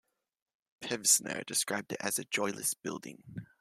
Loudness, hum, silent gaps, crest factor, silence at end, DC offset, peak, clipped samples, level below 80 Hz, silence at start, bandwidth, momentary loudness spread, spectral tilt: -31 LUFS; none; none; 24 dB; 0.15 s; under 0.1%; -10 dBFS; under 0.1%; -76 dBFS; 0.8 s; 16 kHz; 19 LU; -1.5 dB/octave